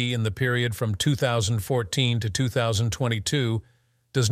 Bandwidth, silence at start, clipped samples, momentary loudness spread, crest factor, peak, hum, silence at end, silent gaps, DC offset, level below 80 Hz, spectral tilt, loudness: 15 kHz; 0 s; under 0.1%; 3 LU; 16 dB; -8 dBFS; none; 0 s; none; under 0.1%; -50 dBFS; -5 dB/octave; -25 LUFS